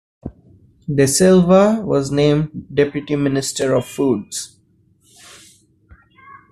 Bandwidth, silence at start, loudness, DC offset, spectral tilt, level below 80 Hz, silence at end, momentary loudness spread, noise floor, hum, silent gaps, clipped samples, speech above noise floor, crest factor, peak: 14 kHz; 0.25 s; -16 LUFS; under 0.1%; -5.5 dB/octave; -50 dBFS; 2.05 s; 21 LU; -57 dBFS; none; none; under 0.1%; 41 dB; 16 dB; -2 dBFS